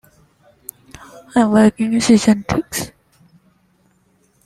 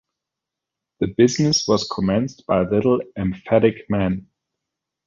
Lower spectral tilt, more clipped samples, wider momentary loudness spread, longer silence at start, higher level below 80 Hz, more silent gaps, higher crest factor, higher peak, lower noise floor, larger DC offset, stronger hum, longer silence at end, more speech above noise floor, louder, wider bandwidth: about the same, -5 dB/octave vs -5.5 dB/octave; neither; first, 23 LU vs 9 LU; first, 1.35 s vs 1 s; about the same, -48 dBFS vs -46 dBFS; neither; about the same, 18 dB vs 18 dB; about the same, -2 dBFS vs -2 dBFS; second, -59 dBFS vs -85 dBFS; neither; neither; first, 1.6 s vs 0.85 s; second, 45 dB vs 66 dB; first, -15 LUFS vs -20 LUFS; first, 14.5 kHz vs 7.6 kHz